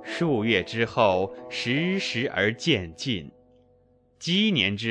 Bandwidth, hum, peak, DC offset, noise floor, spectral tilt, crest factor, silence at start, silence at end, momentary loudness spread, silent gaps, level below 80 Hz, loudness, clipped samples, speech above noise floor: 10 kHz; none; -6 dBFS; under 0.1%; -61 dBFS; -5 dB/octave; 20 dB; 0 s; 0 s; 8 LU; none; -60 dBFS; -25 LUFS; under 0.1%; 36 dB